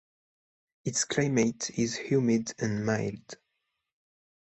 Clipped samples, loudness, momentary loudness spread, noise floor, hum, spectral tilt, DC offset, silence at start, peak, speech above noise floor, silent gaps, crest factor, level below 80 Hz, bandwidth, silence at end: under 0.1%; -29 LUFS; 14 LU; -82 dBFS; none; -4.5 dB/octave; under 0.1%; 0.85 s; -12 dBFS; 53 dB; none; 18 dB; -64 dBFS; 8.4 kHz; 1.05 s